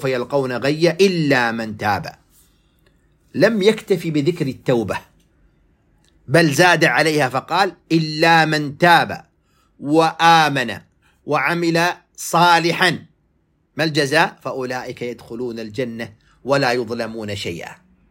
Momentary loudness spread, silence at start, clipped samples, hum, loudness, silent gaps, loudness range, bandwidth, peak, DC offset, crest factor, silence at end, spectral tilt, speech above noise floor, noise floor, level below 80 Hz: 15 LU; 0 s; under 0.1%; none; -17 LUFS; none; 7 LU; 16.5 kHz; 0 dBFS; under 0.1%; 18 dB; 0.35 s; -4.5 dB/octave; 45 dB; -63 dBFS; -58 dBFS